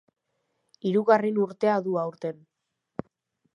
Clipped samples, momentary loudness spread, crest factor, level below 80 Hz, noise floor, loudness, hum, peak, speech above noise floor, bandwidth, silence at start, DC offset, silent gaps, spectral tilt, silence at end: under 0.1%; 18 LU; 22 dB; -72 dBFS; -78 dBFS; -25 LUFS; none; -6 dBFS; 53 dB; 9.8 kHz; 0.85 s; under 0.1%; none; -8 dB/octave; 1.2 s